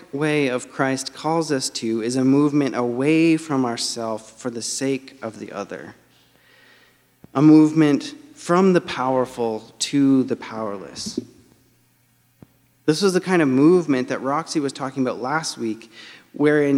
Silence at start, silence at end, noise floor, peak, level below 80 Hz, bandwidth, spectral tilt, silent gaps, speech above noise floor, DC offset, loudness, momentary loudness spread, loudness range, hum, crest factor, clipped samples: 0.15 s; 0 s; -61 dBFS; -4 dBFS; -66 dBFS; 13 kHz; -5.5 dB/octave; none; 41 dB; under 0.1%; -20 LUFS; 16 LU; 7 LU; none; 18 dB; under 0.1%